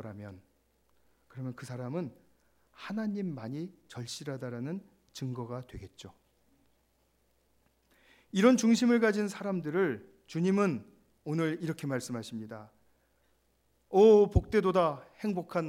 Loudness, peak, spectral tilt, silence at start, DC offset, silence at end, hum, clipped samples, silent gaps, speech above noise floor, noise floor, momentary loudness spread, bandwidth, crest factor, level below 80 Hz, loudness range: -30 LUFS; -10 dBFS; -6 dB/octave; 0 s; under 0.1%; 0 s; none; under 0.1%; none; 42 dB; -72 dBFS; 20 LU; 15.5 kHz; 22 dB; -52 dBFS; 14 LU